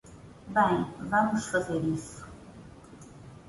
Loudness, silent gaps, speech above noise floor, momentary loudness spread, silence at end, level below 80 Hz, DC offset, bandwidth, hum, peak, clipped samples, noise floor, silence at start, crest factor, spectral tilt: -28 LUFS; none; 22 dB; 24 LU; 0 s; -56 dBFS; under 0.1%; 11.5 kHz; none; -12 dBFS; under 0.1%; -49 dBFS; 0.05 s; 20 dB; -5.5 dB/octave